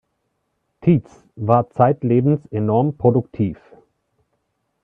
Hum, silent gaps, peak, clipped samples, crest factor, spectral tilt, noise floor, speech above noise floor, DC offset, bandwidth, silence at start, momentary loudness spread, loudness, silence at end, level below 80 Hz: none; none; 0 dBFS; under 0.1%; 20 dB; -11.5 dB/octave; -72 dBFS; 54 dB; under 0.1%; 3.9 kHz; 0.85 s; 8 LU; -19 LUFS; 1.3 s; -54 dBFS